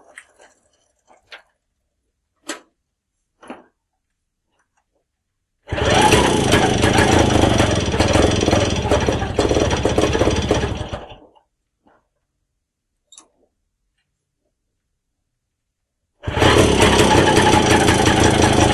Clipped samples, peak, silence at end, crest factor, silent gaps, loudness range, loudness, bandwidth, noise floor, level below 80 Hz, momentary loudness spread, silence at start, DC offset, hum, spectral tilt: under 0.1%; -2 dBFS; 0 s; 16 dB; none; 11 LU; -15 LUFS; 13.5 kHz; -76 dBFS; -30 dBFS; 15 LU; 1.3 s; under 0.1%; none; -4.5 dB/octave